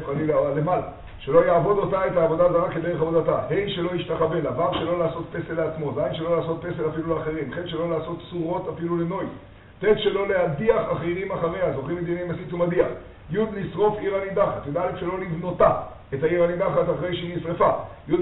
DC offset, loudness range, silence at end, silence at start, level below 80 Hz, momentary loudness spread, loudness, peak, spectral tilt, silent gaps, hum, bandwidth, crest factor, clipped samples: under 0.1%; 5 LU; 0 s; 0 s; -48 dBFS; 9 LU; -24 LUFS; -4 dBFS; -5.5 dB/octave; none; none; 4.1 kHz; 20 dB; under 0.1%